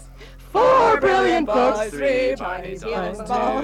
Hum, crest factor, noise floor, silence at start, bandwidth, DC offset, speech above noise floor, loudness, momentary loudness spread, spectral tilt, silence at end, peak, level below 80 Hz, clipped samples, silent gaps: none; 14 dB; -41 dBFS; 0 s; 13 kHz; under 0.1%; 19 dB; -19 LUFS; 12 LU; -5 dB/octave; 0 s; -6 dBFS; -42 dBFS; under 0.1%; none